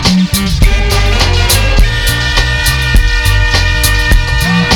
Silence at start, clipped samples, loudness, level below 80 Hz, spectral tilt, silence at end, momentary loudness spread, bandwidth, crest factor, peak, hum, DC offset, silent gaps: 0 s; 0.6%; -10 LUFS; -12 dBFS; -4 dB/octave; 0 s; 2 LU; 19 kHz; 8 dB; 0 dBFS; none; under 0.1%; none